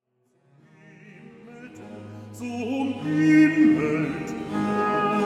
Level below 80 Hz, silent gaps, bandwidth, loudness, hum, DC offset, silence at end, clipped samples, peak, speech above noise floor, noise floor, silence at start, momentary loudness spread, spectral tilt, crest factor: -60 dBFS; none; 10.5 kHz; -22 LUFS; none; under 0.1%; 0 s; under 0.1%; -8 dBFS; 46 dB; -66 dBFS; 1.05 s; 24 LU; -7 dB/octave; 16 dB